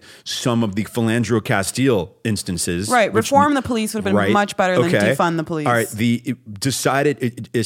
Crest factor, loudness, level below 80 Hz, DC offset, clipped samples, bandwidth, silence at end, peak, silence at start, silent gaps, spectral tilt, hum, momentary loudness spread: 18 dB; -19 LUFS; -52 dBFS; under 0.1%; under 0.1%; 17 kHz; 0 s; -2 dBFS; 0.1 s; none; -5 dB/octave; none; 7 LU